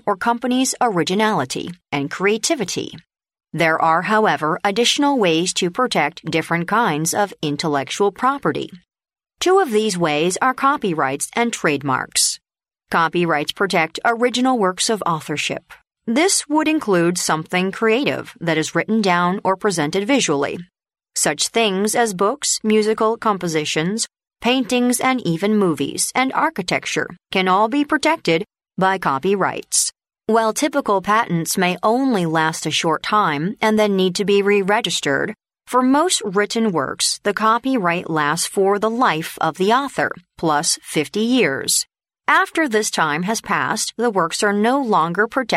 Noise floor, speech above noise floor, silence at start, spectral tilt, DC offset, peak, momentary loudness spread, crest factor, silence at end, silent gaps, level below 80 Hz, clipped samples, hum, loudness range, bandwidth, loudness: -80 dBFS; 61 dB; 0.05 s; -3.5 dB/octave; under 0.1%; -2 dBFS; 6 LU; 16 dB; 0 s; none; -60 dBFS; under 0.1%; none; 2 LU; 16 kHz; -18 LUFS